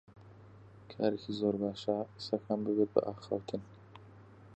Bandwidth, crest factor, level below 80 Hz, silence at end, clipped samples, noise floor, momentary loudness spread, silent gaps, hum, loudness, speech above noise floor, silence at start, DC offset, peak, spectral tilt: 8.4 kHz; 24 dB; -68 dBFS; 0 s; under 0.1%; -56 dBFS; 23 LU; none; none; -35 LUFS; 21 dB; 0.1 s; under 0.1%; -12 dBFS; -7.5 dB/octave